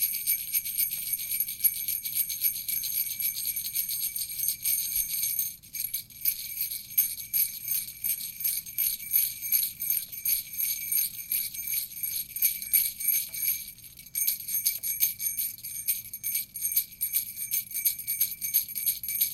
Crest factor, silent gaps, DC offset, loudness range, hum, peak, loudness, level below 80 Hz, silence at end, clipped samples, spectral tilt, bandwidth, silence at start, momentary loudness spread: 24 dB; none; under 0.1%; 2 LU; none; -8 dBFS; -27 LUFS; -64 dBFS; 0 s; under 0.1%; 2.5 dB/octave; 17 kHz; 0 s; 5 LU